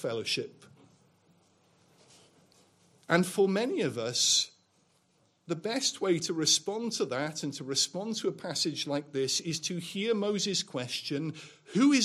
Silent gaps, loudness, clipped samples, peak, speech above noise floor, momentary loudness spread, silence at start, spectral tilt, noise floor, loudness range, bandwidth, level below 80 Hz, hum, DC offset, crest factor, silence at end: none; -30 LUFS; under 0.1%; -10 dBFS; 40 dB; 9 LU; 0 s; -3 dB/octave; -70 dBFS; 4 LU; 15 kHz; -80 dBFS; none; under 0.1%; 22 dB; 0 s